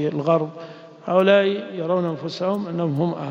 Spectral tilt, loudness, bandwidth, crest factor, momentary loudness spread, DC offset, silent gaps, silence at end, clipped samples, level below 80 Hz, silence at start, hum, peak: -7.5 dB/octave; -21 LUFS; 7.6 kHz; 18 dB; 15 LU; under 0.1%; none; 0 s; under 0.1%; -68 dBFS; 0 s; none; -4 dBFS